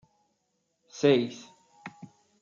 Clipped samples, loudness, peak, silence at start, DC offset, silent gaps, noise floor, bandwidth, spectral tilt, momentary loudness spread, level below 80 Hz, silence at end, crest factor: under 0.1%; -26 LUFS; -10 dBFS; 0.95 s; under 0.1%; none; -77 dBFS; 7.4 kHz; -5.5 dB/octave; 24 LU; -78 dBFS; 0.55 s; 22 dB